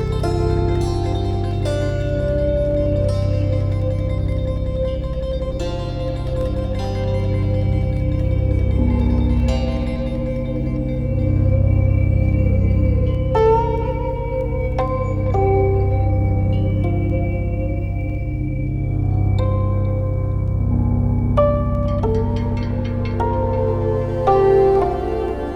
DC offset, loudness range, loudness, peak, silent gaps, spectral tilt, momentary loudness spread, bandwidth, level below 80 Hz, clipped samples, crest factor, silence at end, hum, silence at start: under 0.1%; 4 LU; -20 LUFS; -2 dBFS; none; -9 dB/octave; 6 LU; 7.4 kHz; -24 dBFS; under 0.1%; 16 dB; 0 s; none; 0 s